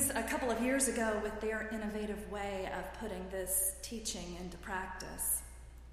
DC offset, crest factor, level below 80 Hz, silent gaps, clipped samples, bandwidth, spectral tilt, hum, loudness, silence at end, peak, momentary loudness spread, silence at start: under 0.1%; 20 dB; -52 dBFS; none; under 0.1%; 15.5 kHz; -3 dB/octave; none; -36 LUFS; 0 s; -16 dBFS; 11 LU; 0 s